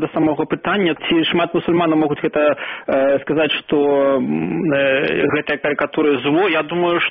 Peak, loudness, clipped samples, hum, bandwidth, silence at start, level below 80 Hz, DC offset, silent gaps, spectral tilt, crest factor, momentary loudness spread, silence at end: -6 dBFS; -17 LUFS; under 0.1%; none; 4.8 kHz; 0 s; -54 dBFS; under 0.1%; none; -3.5 dB/octave; 12 dB; 3 LU; 0 s